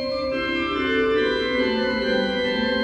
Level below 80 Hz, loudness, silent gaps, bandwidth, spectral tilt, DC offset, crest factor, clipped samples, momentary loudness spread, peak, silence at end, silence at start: -46 dBFS; -22 LUFS; none; 9 kHz; -5.5 dB/octave; under 0.1%; 12 dB; under 0.1%; 3 LU; -10 dBFS; 0 s; 0 s